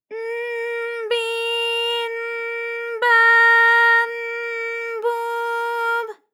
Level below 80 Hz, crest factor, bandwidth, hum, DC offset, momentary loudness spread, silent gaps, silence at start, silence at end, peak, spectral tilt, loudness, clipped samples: under -90 dBFS; 14 dB; 16.5 kHz; none; under 0.1%; 14 LU; none; 0.1 s; 0.2 s; -6 dBFS; 2.5 dB/octave; -18 LUFS; under 0.1%